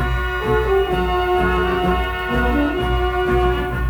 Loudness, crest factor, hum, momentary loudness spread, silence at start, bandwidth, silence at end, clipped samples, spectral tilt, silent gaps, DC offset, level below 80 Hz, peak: -19 LUFS; 12 dB; none; 3 LU; 0 s; over 20 kHz; 0 s; under 0.1%; -7 dB/octave; none; under 0.1%; -24 dBFS; -6 dBFS